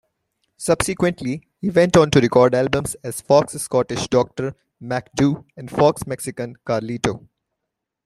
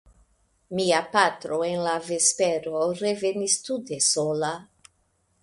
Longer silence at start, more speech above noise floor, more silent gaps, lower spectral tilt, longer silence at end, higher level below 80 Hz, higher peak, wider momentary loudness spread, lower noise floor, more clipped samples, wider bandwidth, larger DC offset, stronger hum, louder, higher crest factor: about the same, 0.6 s vs 0.7 s; first, 62 dB vs 44 dB; neither; first, -5.5 dB/octave vs -2.5 dB/octave; about the same, 0.9 s vs 0.8 s; first, -48 dBFS vs -66 dBFS; first, -2 dBFS vs -6 dBFS; first, 14 LU vs 8 LU; first, -81 dBFS vs -69 dBFS; neither; first, 13.5 kHz vs 11.5 kHz; neither; neither; first, -20 LUFS vs -24 LUFS; about the same, 18 dB vs 20 dB